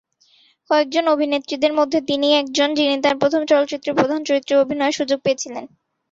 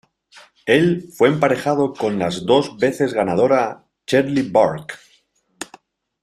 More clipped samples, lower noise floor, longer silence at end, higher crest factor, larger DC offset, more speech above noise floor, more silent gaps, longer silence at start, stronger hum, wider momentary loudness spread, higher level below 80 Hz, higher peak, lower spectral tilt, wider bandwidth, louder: neither; about the same, -57 dBFS vs -60 dBFS; second, 0.45 s vs 0.6 s; about the same, 16 dB vs 18 dB; neither; second, 38 dB vs 43 dB; neither; about the same, 0.7 s vs 0.65 s; neither; second, 4 LU vs 19 LU; second, -64 dBFS vs -58 dBFS; about the same, -2 dBFS vs -2 dBFS; second, -3.5 dB/octave vs -6 dB/octave; second, 7.8 kHz vs 14 kHz; about the same, -18 LUFS vs -18 LUFS